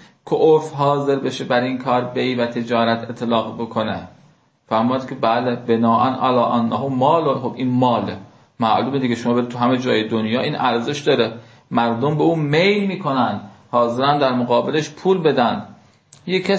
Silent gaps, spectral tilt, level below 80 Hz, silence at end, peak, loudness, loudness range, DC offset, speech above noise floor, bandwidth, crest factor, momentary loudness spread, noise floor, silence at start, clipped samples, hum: none; -6.5 dB/octave; -58 dBFS; 0 s; -2 dBFS; -19 LUFS; 3 LU; under 0.1%; 36 dB; 8 kHz; 16 dB; 7 LU; -54 dBFS; 0.25 s; under 0.1%; none